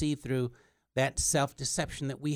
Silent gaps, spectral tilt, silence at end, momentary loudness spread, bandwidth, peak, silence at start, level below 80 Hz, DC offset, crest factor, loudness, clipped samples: none; -4 dB/octave; 0 s; 8 LU; 19 kHz; -14 dBFS; 0 s; -50 dBFS; under 0.1%; 18 dB; -31 LUFS; under 0.1%